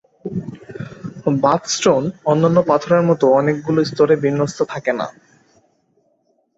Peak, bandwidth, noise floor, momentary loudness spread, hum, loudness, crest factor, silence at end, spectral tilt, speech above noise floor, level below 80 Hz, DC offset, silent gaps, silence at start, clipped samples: 0 dBFS; 8 kHz; -63 dBFS; 15 LU; none; -17 LUFS; 18 dB; 1.45 s; -5.5 dB/octave; 47 dB; -58 dBFS; under 0.1%; none; 0.25 s; under 0.1%